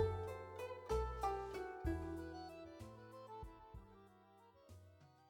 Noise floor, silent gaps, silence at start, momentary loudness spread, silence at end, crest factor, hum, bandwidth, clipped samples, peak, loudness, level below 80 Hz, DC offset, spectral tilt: -67 dBFS; none; 0 s; 23 LU; 0 s; 20 dB; none; 17 kHz; under 0.1%; -28 dBFS; -47 LUFS; -54 dBFS; under 0.1%; -7 dB/octave